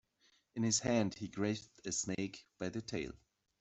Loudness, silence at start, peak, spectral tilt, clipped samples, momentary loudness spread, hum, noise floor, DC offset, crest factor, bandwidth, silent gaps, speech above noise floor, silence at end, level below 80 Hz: -38 LUFS; 0.55 s; -18 dBFS; -4 dB/octave; under 0.1%; 12 LU; none; -74 dBFS; under 0.1%; 22 dB; 8.2 kHz; none; 36 dB; 0.45 s; -68 dBFS